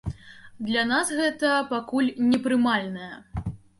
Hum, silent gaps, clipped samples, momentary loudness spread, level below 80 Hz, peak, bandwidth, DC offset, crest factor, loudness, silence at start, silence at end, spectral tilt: none; none; under 0.1%; 14 LU; -48 dBFS; -10 dBFS; 11.5 kHz; under 0.1%; 14 dB; -24 LUFS; 0.05 s; 0.25 s; -4.5 dB/octave